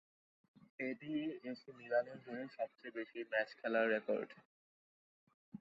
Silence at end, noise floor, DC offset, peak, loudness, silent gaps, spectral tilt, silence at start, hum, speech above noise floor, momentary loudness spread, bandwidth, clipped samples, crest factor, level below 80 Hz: 0.05 s; under -90 dBFS; under 0.1%; -22 dBFS; -41 LUFS; 4.45-5.27 s, 5.34-5.52 s; -3 dB/octave; 0.8 s; none; over 49 dB; 14 LU; 7.4 kHz; under 0.1%; 20 dB; under -90 dBFS